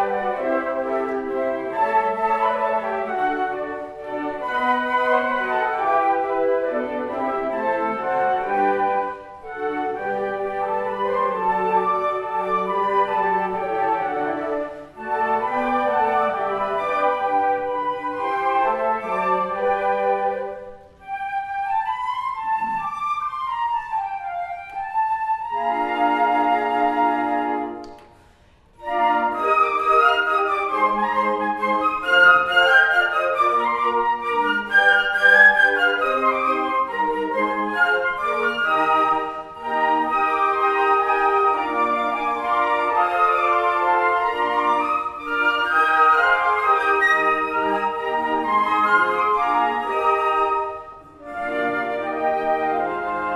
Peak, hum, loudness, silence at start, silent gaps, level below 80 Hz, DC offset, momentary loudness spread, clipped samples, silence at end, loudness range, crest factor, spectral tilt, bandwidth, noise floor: 0 dBFS; none; -20 LUFS; 0 s; none; -56 dBFS; under 0.1%; 9 LU; under 0.1%; 0 s; 7 LU; 20 dB; -4.5 dB/octave; 13 kHz; -53 dBFS